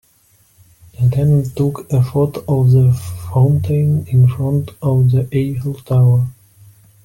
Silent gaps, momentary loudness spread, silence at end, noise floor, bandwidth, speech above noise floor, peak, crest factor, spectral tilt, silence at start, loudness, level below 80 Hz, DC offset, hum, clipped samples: none; 7 LU; 0.7 s; -54 dBFS; 16 kHz; 40 dB; -4 dBFS; 12 dB; -9.5 dB/octave; 1 s; -15 LUFS; -44 dBFS; under 0.1%; none; under 0.1%